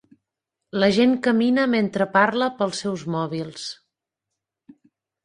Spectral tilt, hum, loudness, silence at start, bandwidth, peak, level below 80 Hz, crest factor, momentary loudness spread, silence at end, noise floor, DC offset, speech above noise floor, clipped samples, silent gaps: -5.5 dB/octave; none; -21 LUFS; 0.75 s; 10.5 kHz; -2 dBFS; -64 dBFS; 20 dB; 13 LU; 1.5 s; -84 dBFS; under 0.1%; 63 dB; under 0.1%; none